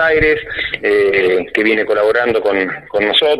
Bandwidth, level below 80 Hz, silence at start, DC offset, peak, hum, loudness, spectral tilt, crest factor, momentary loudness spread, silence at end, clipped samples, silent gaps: 12 kHz; -40 dBFS; 0 s; under 0.1%; 0 dBFS; none; -14 LUFS; -5 dB/octave; 14 dB; 5 LU; 0 s; under 0.1%; none